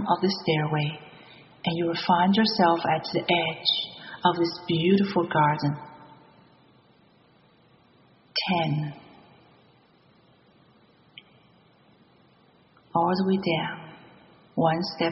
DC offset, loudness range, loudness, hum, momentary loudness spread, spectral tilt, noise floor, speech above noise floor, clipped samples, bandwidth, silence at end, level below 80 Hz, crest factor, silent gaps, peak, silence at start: under 0.1%; 9 LU; -25 LUFS; none; 14 LU; -4 dB/octave; -59 dBFS; 35 dB; under 0.1%; 6 kHz; 0 s; -66 dBFS; 22 dB; none; -6 dBFS; 0 s